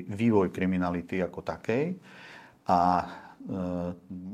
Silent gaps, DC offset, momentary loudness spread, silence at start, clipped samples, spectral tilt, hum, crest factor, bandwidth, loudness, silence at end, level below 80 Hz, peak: none; under 0.1%; 17 LU; 0 s; under 0.1%; -8 dB/octave; none; 18 dB; 9.8 kHz; -29 LUFS; 0 s; -64 dBFS; -10 dBFS